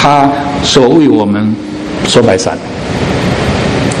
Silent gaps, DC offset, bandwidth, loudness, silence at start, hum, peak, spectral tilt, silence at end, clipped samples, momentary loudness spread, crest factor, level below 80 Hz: none; under 0.1%; 13 kHz; -10 LUFS; 0 s; none; 0 dBFS; -5 dB/octave; 0 s; 1%; 10 LU; 10 dB; -30 dBFS